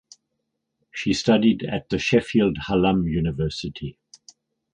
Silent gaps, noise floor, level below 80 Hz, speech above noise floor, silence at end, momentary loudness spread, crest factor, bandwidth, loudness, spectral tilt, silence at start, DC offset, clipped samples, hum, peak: none; -78 dBFS; -44 dBFS; 56 dB; 0.8 s; 14 LU; 18 dB; 9.6 kHz; -22 LUFS; -6 dB/octave; 0.95 s; under 0.1%; under 0.1%; none; -4 dBFS